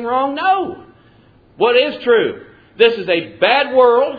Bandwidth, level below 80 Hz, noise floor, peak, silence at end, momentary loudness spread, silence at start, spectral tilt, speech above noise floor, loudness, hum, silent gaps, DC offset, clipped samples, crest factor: 5 kHz; -58 dBFS; -49 dBFS; 0 dBFS; 0 s; 7 LU; 0 s; -6.5 dB/octave; 34 dB; -15 LUFS; none; none; under 0.1%; under 0.1%; 16 dB